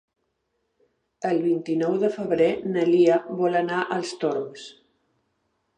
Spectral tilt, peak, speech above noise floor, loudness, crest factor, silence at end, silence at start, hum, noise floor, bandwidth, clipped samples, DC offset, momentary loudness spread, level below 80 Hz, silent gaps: -6.5 dB/octave; -8 dBFS; 52 dB; -23 LUFS; 18 dB; 1.05 s; 1.2 s; none; -75 dBFS; 9.4 kHz; under 0.1%; under 0.1%; 12 LU; -70 dBFS; none